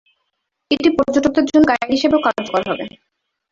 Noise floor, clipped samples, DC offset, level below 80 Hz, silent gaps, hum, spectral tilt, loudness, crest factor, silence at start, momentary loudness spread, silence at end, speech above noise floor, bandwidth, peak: -73 dBFS; under 0.1%; under 0.1%; -48 dBFS; none; none; -5 dB/octave; -16 LUFS; 16 dB; 0.7 s; 10 LU; 0.65 s; 57 dB; 7.6 kHz; -2 dBFS